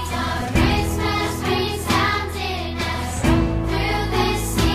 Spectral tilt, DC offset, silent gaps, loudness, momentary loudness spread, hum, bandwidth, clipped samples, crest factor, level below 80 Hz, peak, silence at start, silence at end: -5 dB/octave; under 0.1%; none; -21 LUFS; 5 LU; none; 15.5 kHz; under 0.1%; 16 dB; -28 dBFS; -4 dBFS; 0 s; 0 s